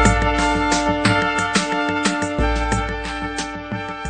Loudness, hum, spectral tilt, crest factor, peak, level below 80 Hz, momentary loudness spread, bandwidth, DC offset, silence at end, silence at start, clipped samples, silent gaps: -20 LUFS; none; -4.5 dB/octave; 18 dB; -2 dBFS; -28 dBFS; 9 LU; 9.4 kHz; under 0.1%; 0 s; 0 s; under 0.1%; none